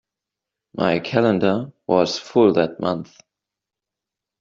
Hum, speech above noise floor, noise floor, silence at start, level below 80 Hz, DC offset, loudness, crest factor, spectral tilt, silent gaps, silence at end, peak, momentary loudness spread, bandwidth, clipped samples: none; 67 dB; -86 dBFS; 0.75 s; -62 dBFS; under 0.1%; -20 LUFS; 20 dB; -6 dB/octave; none; 1.35 s; -2 dBFS; 9 LU; 7.6 kHz; under 0.1%